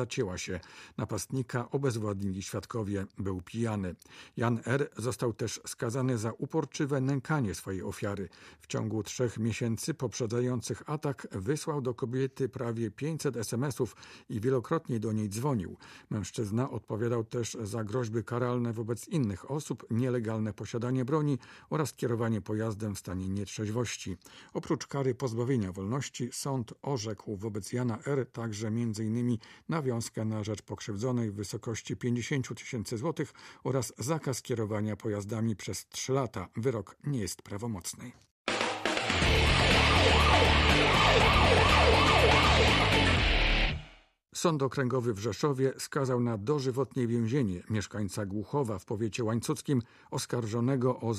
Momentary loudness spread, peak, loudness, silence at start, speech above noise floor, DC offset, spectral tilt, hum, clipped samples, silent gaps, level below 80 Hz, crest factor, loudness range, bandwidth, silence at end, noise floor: 14 LU; -10 dBFS; -31 LUFS; 0 s; 25 dB; under 0.1%; -5 dB/octave; none; under 0.1%; 38.31-38.45 s; -42 dBFS; 20 dB; 11 LU; 15 kHz; 0 s; -58 dBFS